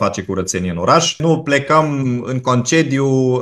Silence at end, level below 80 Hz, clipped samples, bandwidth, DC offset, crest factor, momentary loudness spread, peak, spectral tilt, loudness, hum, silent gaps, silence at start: 0 s; -50 dBFS; under 0.1%; 12.5 kHz; under 0.1%; 16 dB; 6 LU; 0 dBFS; -5 dB/octave; -16 LUFS; none; none; 0 s